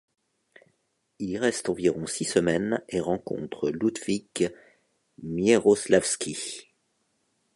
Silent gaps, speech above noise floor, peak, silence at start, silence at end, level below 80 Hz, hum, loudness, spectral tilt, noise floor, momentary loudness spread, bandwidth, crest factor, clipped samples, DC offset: none; 48 dB; -6 dBFS; 1.2 s; 0.95 s; -60 dBFS; none; -26 LUFS; -4.5 dB/octave; -73 dBFS; 13 LU; 11.5 kHz; 22 dB; under 0.1%; under 0.1%